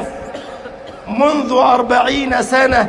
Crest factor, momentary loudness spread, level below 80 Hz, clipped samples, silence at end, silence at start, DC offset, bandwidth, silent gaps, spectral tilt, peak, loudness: 14 dB; 19 LU; -40 dBFS; under 0.1%; 0 s; 0 s; under 0.1%; 11.5 kHz; none; -4 dB/octave; 0 dBFS; -14 LUFS